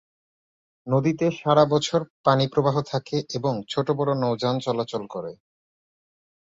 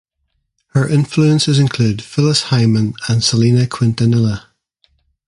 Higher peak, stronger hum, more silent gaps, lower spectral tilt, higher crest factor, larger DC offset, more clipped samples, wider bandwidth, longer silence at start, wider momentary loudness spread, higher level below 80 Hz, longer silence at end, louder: about the same, -4 dBFS vs -2 dBFS; neither; first, 2.10-2.24 s vs none; about the same, -6.5 dB/octave vs -5.5 dB/octave; first, 22 dB vs 14 dB; neither; neither; second, 7.8 kHz vs 11.5 kHz; about the same, 0.85 s vs 0.75 s; first, 10 LU vs 5 LU; second, -62 dBFS vs -46 dBFS; first, 1.15 s vs 0.9 s; second, -23 LUFS vs -14 LUFS